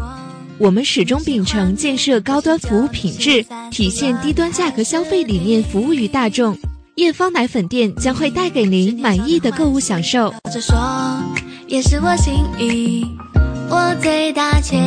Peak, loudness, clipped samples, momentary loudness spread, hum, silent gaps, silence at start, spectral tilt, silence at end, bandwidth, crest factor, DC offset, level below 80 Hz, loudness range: -2 dBFS; -16 LUFS; under 0.1%; 5 LU; none; none; 0 s; -5 dB/octave; 0 s; 10.5 kHz; 14 dB; under 0.1%; -26 dBFS; 1 LU